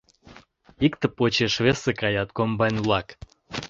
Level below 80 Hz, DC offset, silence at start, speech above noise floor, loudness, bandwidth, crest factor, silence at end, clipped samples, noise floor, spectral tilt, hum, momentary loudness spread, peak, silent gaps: -50 dBFS; under 0.1%; 0.25 s; 28 dB; -23 LUFS; 8 kHz; 20 dB; 0.05 s; under 0.1%; -51 dBFS; -5.5 dB/octave; none; 5 LU; -6 dBFS; none